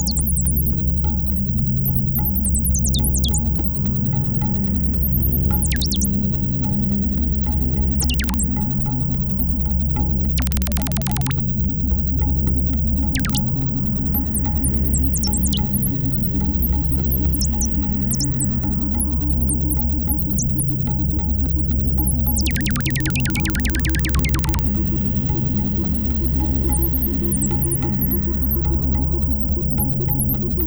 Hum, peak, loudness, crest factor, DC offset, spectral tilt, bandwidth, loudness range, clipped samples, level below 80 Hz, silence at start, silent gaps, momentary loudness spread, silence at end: none; -6 dBFS; -15 LUFS; 12 dB; under 0.1%; -5 dB/octave; over 20 kHz; 0 LU; under 0.1%; -24 dBFS; 0 s; none; 1 LU; 0 s